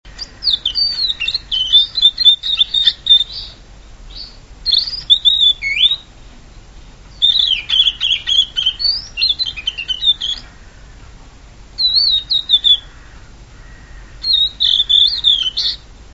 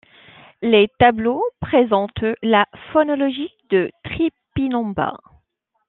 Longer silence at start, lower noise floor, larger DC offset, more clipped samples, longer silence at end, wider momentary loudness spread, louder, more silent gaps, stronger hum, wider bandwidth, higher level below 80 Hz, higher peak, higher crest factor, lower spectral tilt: second, 0.05 s vs 0.6 s; second, -39 dBFS vs -69 dBFS; first, 0.1% vs under 0.1%; neither; second, 0.1 s vs 0.7 s; first, 12 LU vs 9 LU; first, -12 LUFS vs -19 LUFS; neither; neither; first, 11 kHz vs 4.2 kHz; first, -38 dBFS vs -48 dBFS; about the same, 0 dBFS vs -2 dBFS; about the same, 16 dB vs 18 dB; second, 0 dB/octave vs -9.5 dB/octave